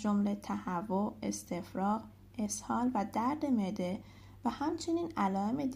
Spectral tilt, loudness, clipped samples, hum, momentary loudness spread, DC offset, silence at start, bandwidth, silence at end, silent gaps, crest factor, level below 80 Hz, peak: -5.5 dB/octave; -35 LUFS; under 0.1%; none; 7 LU; under 0.1%; 0 s; 15.5 kHz; 0 s; none; 14 dB; -62 dBFS; -20 dBFS